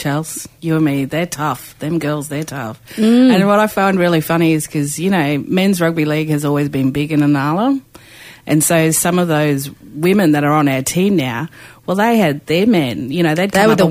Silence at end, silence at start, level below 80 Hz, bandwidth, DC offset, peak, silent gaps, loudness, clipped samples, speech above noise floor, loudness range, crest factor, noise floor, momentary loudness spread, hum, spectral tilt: 0 s; 0 s; -50 dBFS; 16 kHz; under 0.1%; 0 dBFS; none; -15 LUFS; under 0.1%; 25 dB; 2 LU; 14 dB; -39 dBFS; 10 LU; none; -5.5 dB/octave